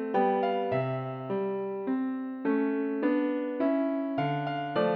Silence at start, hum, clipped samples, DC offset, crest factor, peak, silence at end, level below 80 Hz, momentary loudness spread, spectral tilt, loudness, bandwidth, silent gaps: 0 s; none; under 0.1%; under 0.1%; 14 dB; -14 dBFS; 0 s; -76 dBFS; 6 LU; -9.5 dB/octave; -30 LUFS; 5 kHz; none